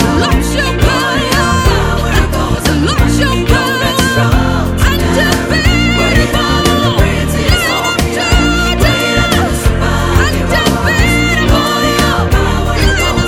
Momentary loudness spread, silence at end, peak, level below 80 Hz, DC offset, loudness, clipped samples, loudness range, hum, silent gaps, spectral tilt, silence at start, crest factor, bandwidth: 2 LU; 0 s; 0 dBFS; -18 dBFS; under 0.1%; -11 LUFS; 0.2%; 1 LU; none; none; -4.5 dB/octave; 0 s; 10 dB; 19.5 kHz